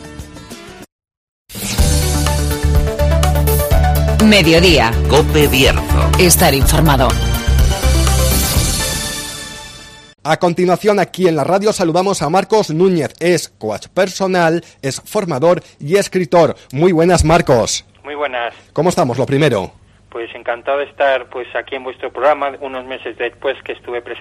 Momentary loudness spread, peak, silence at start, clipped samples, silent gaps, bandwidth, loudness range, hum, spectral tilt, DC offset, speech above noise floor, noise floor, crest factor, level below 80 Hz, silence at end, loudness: 15 LU; 0 dBFS; 0 s; under 0.1%; 0.92-0.99 s, 1.17-1.45 s; 15.5 kHz; 7 LU; none; -4.5 dB/octave; under 0.1%; 22 dB; -36 dBFS; 14 dB; -22 dBFS; 0 s; -14 LUFS